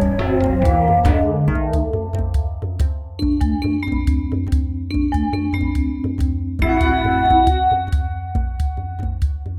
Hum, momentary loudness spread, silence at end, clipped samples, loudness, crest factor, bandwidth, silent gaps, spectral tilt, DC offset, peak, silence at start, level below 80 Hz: none; 8 LU; 0 s; under 0.1%; -19 LUFS; 14 dB; 9.8 kHz; none; -8.5 dB/octave; under 0.1%; -2 dBFS; 0 s; -22 dBFS